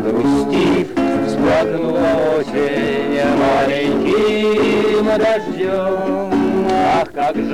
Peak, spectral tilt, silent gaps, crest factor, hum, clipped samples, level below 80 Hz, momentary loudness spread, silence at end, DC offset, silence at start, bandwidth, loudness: -6 dBFS; -6 dB/octave; none; 10 dB; none; under 0.1%; -44 dBFS; 4 LU; 0 s; 0.9%; 0 s; 13 kHz; -16 LUFS